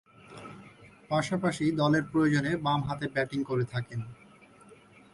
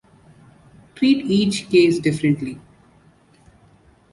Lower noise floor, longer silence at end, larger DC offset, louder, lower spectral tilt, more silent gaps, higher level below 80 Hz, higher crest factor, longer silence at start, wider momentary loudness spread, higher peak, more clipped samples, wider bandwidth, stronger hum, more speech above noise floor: about the same, -55 dBFS vs -54 dBFS; second, 0.4 s vs 1.55 s; neither; second, -29 LUFS vs -18 LUFS; about the same, -6.5 dB/octave vs -6 dB/octave; neither; about the same, -60 dBFS vs -56 dBFS; about the same, 16 dB vs 18 dB; second, 0.3 s vs 1 s; first, 21 LU vs 10 LU; second, -14 dBFS vs -4 dBFS; neither; about the same, 11.5 kHz vs 11.5 kHz; neither; second, 27 dB vs 36 dB